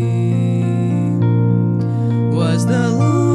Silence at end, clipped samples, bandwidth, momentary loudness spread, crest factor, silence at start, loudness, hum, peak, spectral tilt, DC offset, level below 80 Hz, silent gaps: 0 s; under 0.1%; 11 kHz; 2 LU; 12 dB; 0 s; -16 LUFS; none; -4 dBFS; -8 dB/octave; under 0.1%; -58 dBFS; none